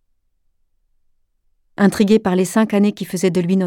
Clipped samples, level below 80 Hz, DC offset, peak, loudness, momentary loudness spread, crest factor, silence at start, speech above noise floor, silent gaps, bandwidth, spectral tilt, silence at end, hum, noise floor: under 0.1%; -56 dBFS; under 0.1%; -2 dBFS; -16 LUFS; 4 LU; 16 dB; 1.8 s; 48 dB; none; 16 kHz; -6.5 dB/octave; 0 s; none; -63 dBFS